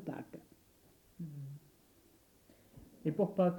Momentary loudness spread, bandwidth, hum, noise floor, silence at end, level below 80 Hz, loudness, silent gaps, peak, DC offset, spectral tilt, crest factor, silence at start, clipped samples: 25 LU; 19 kHz; none; -67 dBFS; 0 s; -72 dBFS; -39 LUFS; none; -18 dBFS; under 0.1%; -9 dB/octave; 22 dB; 0 s; under 0.1%